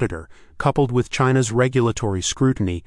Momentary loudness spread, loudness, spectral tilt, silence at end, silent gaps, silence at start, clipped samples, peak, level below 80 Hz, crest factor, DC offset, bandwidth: 5 LU; -20 LUFS; -5.5 dB/octave; 0.05 s; none; 0 s; under 0.1%; -4 dBFS; -42 dBFS; 16 dB; under 0.1%; 11.5 kHz